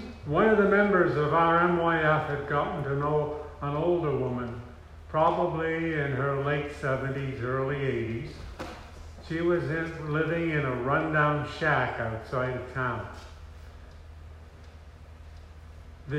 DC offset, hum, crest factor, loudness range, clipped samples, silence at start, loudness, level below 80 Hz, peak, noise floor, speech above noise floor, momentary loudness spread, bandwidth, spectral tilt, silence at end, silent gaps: under 0.1%; none; 18 dB; 9 LU; under 0.1%; 0 s; -27 LUFS; -50 dBFS; -10 dBFS; -48 dBFS; 21 dB; 23 LU; 10 kHz; -8 dB/octave; 0 s; none